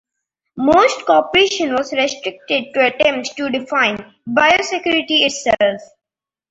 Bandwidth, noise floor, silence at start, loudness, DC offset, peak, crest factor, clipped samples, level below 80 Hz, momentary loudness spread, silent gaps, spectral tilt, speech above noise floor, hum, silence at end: 8.2 kHz; -89 dBFS; 0.55 s; -16 LUFS; under 0.1%; -2 dBFS; 16 dB; under 0.1%; -52 dBFS; 8 LU; none; -2.5 dB/octave; 73 dB; none; 0.65 s